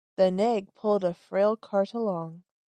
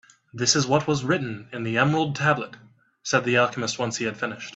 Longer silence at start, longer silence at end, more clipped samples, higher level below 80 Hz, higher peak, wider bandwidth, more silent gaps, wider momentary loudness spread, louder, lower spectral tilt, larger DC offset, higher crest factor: second, 0.2 s vs 0.35 s; first, 0.3 s vs 0.05 s; neither; second, -72 dBFS vs -62 dBFS; second, -10 dBFS vs -4 dBFS; about the same, 9 kHz vs 8.2 kHz; neither; second, 7 LU vs 11 LU; second, -27 LUFS vs -23 LUFS; first, -7.5 dB/octave vs -4 dB/octave; neither; about the same, 16 dB vs 20 dB